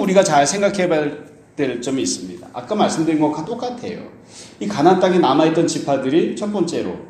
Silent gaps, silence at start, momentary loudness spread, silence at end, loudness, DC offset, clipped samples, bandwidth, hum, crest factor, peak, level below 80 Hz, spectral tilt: none; 0 s; 18 LU; 0 s; -18 LUFS; under 0.1%; under 0.1%; 13 kHz; none; 18 dB; 0 dBFS; -58 dBFS; -5 dB/octave